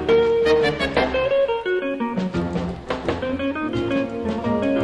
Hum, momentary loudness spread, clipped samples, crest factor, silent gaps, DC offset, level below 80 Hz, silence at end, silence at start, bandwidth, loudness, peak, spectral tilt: none; 8 LU; under 0.1%; 16 dB; none; under 0.1%; -42 dBFS; 0 s; 0 s; 10.5 kHz; -22 LUFS; -6 dBFS; -6.5 dB/octave